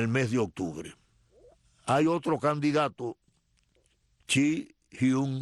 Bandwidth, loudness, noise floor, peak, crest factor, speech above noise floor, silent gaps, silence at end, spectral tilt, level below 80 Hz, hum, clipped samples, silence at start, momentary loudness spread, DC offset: 12.5 kHz; -28 LUFS; -70 dBFS; -12 dBFS; 18 dB; 42 dB; none; 0 s; -5.5 dB/octave; -66 dBFS; none; under 0.1%; 0 s; 14 LU; under 0.1%